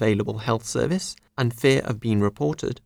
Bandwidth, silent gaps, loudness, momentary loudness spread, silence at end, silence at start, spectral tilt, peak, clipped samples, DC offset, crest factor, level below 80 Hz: 18 kHz; none; -24 LUFS; 6 LU; 0.1 s; 0 s; -5.5 dB/octave; -6 dBFS; under 0.1%; under 0.1%; 18 dB; -52 dBFS